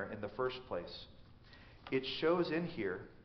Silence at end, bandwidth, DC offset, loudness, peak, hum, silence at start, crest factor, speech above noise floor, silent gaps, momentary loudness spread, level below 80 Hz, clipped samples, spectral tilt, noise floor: 0 s; 6.2 kHz; under 0.1%; -38 LUFS; -20 dBFS; none; 0 s; 18 dB; 20 dB; none; 22 LU; -64 dBFS; under 0.1%; -4 dB/octave; -58 dBFS